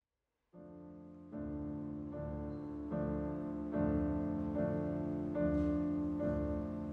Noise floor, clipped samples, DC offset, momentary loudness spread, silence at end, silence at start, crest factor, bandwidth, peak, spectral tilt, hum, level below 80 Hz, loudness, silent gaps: -88 dBFS; under 0.1%; under 0.1%; 17 LU; 0 s; 0.55 s; 16 dB; 4.2 kHz; -22 dBFS; -11 dB/octave; none; -50 dBFS; -38 LUFS; none